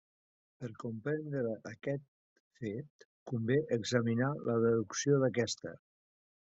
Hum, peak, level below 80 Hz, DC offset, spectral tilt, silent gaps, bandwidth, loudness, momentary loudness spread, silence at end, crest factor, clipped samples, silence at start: none; -16 dBFS; -74 dBFS; under 0.1%; -6 dB/octave; 2.08-2.51 s, 2.90-2.99 s, 3.05-3.26 s; 8 kHz; -34 LUFS; 14 LU; 0.7 s; 20 dB; under 0.1%; 0.6 s